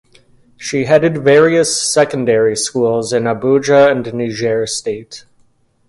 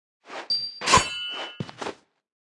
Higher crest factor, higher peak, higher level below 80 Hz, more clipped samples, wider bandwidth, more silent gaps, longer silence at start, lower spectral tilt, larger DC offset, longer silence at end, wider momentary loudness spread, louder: second, 14 dB vs 26 dB; about the same, 0 dBFS vs -2 dBFS; second, -54 dBFS vs -48 dBFS; neither; about the same, 11.5 kHz vs 12 kHz; neither; first, 0.6 s vs 0.25 s; first, -4 dB/octave vs -1.5 dB/octave; neither; first, 0.7 s vs 0.45 s; second, 11 LU vs 17 LU; first, -13 LUFS vs -24 LUFS